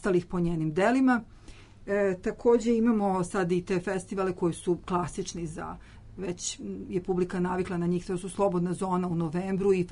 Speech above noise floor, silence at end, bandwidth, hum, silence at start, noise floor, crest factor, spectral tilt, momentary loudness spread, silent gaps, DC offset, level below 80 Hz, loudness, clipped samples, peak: 21 dB; 0 s; 11 kHz; none; 0 s; -49 dBFS; 16 dB; -6.5 dB/octave; 11 LU; none; under 0.1%; -50 dBFS; -28 LUFS; under 0.1%; -12 dBFS